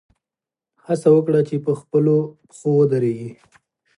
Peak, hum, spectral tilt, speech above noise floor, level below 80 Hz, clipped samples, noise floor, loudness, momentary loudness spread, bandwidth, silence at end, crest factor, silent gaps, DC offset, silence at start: -4 dBFS; none; -9 dB/octave; 71 dB; -68 dBFS; under 0.1%; -89 dBFS; -19 LUFS; 13 LU; 11 kHz; 0.65 s; 16 dB; none; under 0.1%; 0.9 s